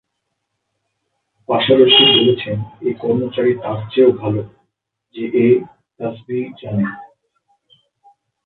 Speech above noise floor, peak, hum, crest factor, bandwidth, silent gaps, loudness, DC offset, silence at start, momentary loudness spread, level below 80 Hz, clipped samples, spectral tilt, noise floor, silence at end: 59 dB; 0 dBFS; none; 18 dB; 4.3 kHz; none; -15 LUFS; under 0.1%; 1.5 s; 18 LU; -56 dBFS; under 0.1%; -9 dB/octave; -74 dBFS; 1.4 s